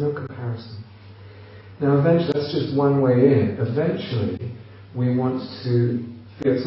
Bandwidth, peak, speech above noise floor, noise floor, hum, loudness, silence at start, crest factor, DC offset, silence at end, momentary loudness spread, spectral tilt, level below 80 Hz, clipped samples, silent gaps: 5.8 kHz; -4 dBFS; 23 dB; -43 dBFS; none; -22 LUFS; 0 s; 18 dB; under 0.1%; 0 s; 17 LU; -7.5 dB/octave; -60 dBFS; under 0.1%; none